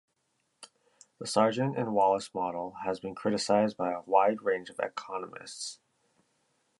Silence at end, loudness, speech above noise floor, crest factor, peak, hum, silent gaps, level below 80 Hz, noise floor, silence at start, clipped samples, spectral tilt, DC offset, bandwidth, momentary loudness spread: 1.05 s; -30 LUFS; 47 dB; 22 dB; -10 dBFS; none; none; -72 dBFS; -77 dBFS; 0.6 s; under 0.1%; -5 dB/octave; under 0.1%; 11.5 kHz; 13 LU